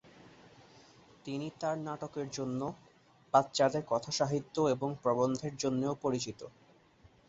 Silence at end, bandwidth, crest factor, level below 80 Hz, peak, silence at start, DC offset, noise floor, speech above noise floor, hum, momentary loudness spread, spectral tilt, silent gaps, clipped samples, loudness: 0.8 s; 8.2 kHz; 24 dB; -70 dBFS; -12 dBFS; 0.15 s; under 0.1%; -63 dBFS; 30 dB; none; 12 LU; -5 dB/octave; none; under 0.1%; -34 LUFS